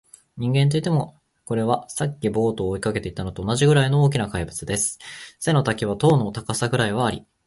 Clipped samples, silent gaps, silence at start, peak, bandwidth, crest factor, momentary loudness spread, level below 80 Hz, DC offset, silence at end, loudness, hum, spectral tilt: under 0.1%; none; 0.35 s; -4 dBFS; 11.5 kHz; 18 dB; 10 LU; -46 dBFS; under 0.1%; 0.25 s; -22 LUFS; none; -5.5 dB/octave